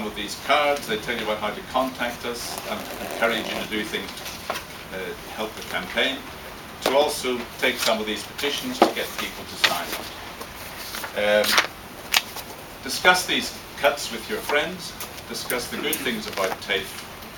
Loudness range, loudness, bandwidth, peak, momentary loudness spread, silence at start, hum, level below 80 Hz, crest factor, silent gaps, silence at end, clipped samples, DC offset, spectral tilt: 6 LU; -24 LUFS; 19.5 kHz; 0 dBFS; 14 LU; 0 s; none; -52 dBFS; 26 dB; none; 0 s; under 0.1%; under 0.1%; -2 dB/octave